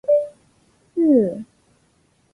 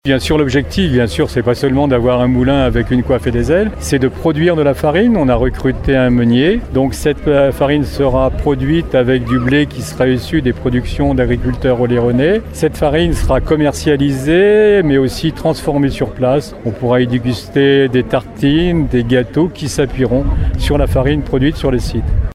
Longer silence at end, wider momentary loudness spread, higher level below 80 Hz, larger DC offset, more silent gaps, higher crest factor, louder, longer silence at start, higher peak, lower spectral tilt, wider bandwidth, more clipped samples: first, 0.9 s vs 0 s; first, 19 LU vs 5 LU; second, -64 dBFS vs -24 dBFS; neither; neither; about the same, 16 dB vs 12 dB; second, -19 LUFS vs -13 LUFS; about the same, 0.1 s vs 0.05 s; second, -6 dBFS vs 0 dBFS; first, -10 dB/octave vs -6.5 dB/octave; second, 11 kHz vs 15.5 kHz; neither